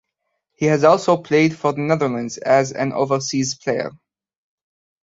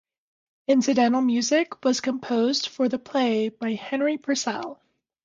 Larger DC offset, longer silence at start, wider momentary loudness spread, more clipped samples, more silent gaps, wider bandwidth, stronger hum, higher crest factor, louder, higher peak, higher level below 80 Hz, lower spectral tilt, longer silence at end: neither; about the same, 0.6 s vs 0.7 s; about the same, 9 LU vs 8 LU; neither; neither; about the same, 8 kHz vs 7.8 kHz; neither; about the same, 18 dB vs 16 dB; first, -19 LUFS vs -24 LUFS; first, -2 dBFS vs -8 dBFS; first, -62 dBFS vs -72 dBFS; first, -5 dB/octave vs -3.5 dB/octave; first, 1.1 s vs 0.5 s